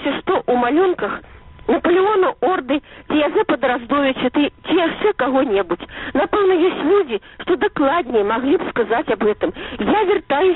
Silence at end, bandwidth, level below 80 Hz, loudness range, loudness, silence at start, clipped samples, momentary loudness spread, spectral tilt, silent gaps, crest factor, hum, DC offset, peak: 0 s; 4.1 kHz; -48 dBFS; 1 LU; -18 LUFS; 0 s; under 0.1%; 8 LU; -3 dB/octave; none; 12 dB; none; under 0.1%; -6 dBFS